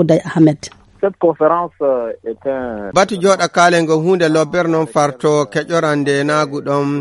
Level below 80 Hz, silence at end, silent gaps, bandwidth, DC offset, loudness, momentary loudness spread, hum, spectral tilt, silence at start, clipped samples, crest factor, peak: -52 dBFS; 0 s; none; 11.5 kHz; under 0.1%; -15 LUFS; 9 LU; none; -5.5 dB/octave; 0 s; under 0.1%; 14 dB; 0 dBFS